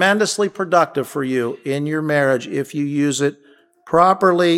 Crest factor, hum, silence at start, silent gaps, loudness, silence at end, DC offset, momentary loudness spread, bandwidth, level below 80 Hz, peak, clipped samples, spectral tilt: 18 dB; none; 0 s; none; -18 LUFS; 0 s; under 0.1%; 8 LU; 16 kHz; -60 dBFS; 0 dBFS; under 0.1%; -5 dB/octave